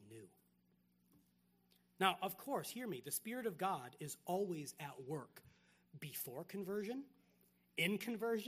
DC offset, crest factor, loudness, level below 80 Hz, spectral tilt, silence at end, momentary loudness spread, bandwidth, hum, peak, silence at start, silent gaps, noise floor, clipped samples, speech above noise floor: under 0.1%; 26 dB; -43 LUFS; -86 dBFS; -4 dB/octave; 0 s; 12 LU; 15.5 kHz; 60 Hz at -70 dBFS; -18 dBFS; 0 s; none; -77 dBFS; under 0.1%; 34 dB